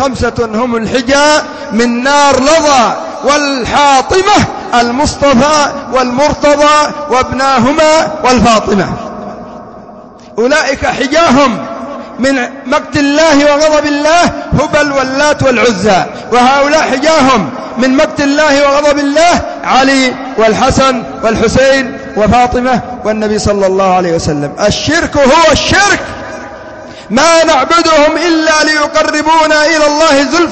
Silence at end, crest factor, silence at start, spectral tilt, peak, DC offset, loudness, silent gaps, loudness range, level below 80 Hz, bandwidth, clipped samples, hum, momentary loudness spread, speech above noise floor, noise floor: 0 s; 8 dB; 0 s; -4 dB/octave; 0 dBFS; under 0.1%; -9 LUFS; none; 3 LU; -32 dBFS; 9 kHz; under 0.1%; none; 8 LU; 23 dB; -31 dBFS